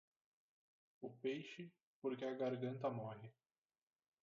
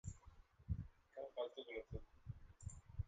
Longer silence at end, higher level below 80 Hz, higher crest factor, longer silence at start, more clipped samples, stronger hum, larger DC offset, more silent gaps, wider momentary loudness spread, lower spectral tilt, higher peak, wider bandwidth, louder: first, 0.9 s vs 0 s; second, under -90 dBFS vs -58 dBFS; about the same, 18 dB vs 20 dB; first, 1 s vs 0.05 s; neither; neither; neither; first, 1.83-2.02 s vs none; about the same, 14 LU vs 12 LU; about the same, -6 dB/octave vs -6 dB/octave; about the same, -30 dBFS vs -32 dBFS; second, 7 kHz vs 9 kHz; first, -47 LUFS vs -52 LUFS